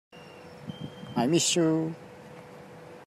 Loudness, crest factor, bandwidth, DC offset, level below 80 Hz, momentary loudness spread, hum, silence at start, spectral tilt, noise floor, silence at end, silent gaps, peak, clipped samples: -26 LUFS; 18 dB; 14.5 kHz; under 0.1%; -70 dBFS; 24 LU; none; 0.15 s; -4 dB/octave; -47 dBFS; 0 s; none; -12 dBFS; under 0.1%